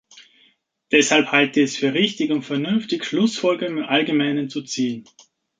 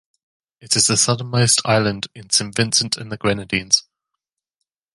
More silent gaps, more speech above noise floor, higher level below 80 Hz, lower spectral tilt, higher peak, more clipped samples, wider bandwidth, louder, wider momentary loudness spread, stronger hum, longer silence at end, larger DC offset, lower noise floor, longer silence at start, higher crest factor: neither; second, 40 dB vs 63 dB; second, -68 dBFS vs -52 dBFS; first, -4 dB/octave vs -2.5 dB/octave; about the same, -2 dBFS vs -2 dBFS; neither; second, 9.4 kHz vs 11.5 kHz; second, -20 LUFS vs -17 LUFS; about the same, 9 LU vs 8 LU; neither; second, 0.55 s vs 1.15 s; neither; second, -60 dBFS vs -81 dBFS; second, 0.15 s vs 0.65 s; about the same, 20 dB vs 20 dB